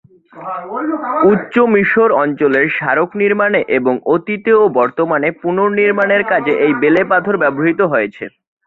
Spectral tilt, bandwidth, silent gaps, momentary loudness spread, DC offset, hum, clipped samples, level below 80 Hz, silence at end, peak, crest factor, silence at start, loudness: -8.5 dB/octave; 4.2 kHz; none; 9 LU; under 0.1%; none; under 0.1%; -58 dBFS; 0.4 s; -2 dBFS; 12 dB; 0.35 s; -13 LUFS